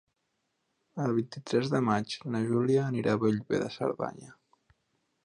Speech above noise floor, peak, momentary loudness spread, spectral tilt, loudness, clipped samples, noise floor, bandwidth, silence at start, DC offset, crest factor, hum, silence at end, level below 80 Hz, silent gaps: 50 dB; -12 dBFS; 7 LU; -7 dB/octave; -30 LUFS; under 0.1%; -79 dBFS; 10.5 kHz; 0.95 s; under 0.1%; 20 dB; none; 0.9 s; -68 dBFS; none